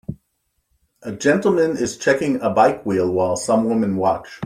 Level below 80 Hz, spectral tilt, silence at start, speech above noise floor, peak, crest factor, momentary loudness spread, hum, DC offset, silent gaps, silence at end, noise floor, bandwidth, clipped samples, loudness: -56 dBFS; -5.5 dB/octave; 0.1 s; 52 dB; -2 dBFS; 18 dB; 5 LU; none; under 0.1%; none; 0 s; -71 dBFS; 15 kHz; under 0.1%; -19 LUFS